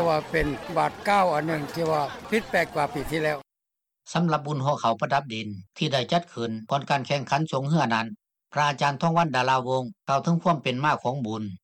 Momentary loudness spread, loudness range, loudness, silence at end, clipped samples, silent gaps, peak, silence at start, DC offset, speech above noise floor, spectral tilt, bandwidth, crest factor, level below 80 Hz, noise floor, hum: 7 LU; 3 LU; -26 LUFS; 0.05 s; under 0.1%; none; -10 dBFS; 0 s; under 0.1%; 60 dB; -5.5 dB/octave; 15.5 kHz; 16 dB; -50 dBFS; -85 dBFS; none